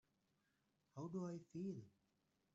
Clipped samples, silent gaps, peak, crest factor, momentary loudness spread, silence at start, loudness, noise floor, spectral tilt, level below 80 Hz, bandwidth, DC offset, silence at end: under 0.1%; none; -38 dBFS; 16 dB; 12 LU; 0.95 s; -51 LUFS; -85 dBFS; -9.5 dB/octave; -88 dBFS; 8 kHz; under 0.1%; 0.65 s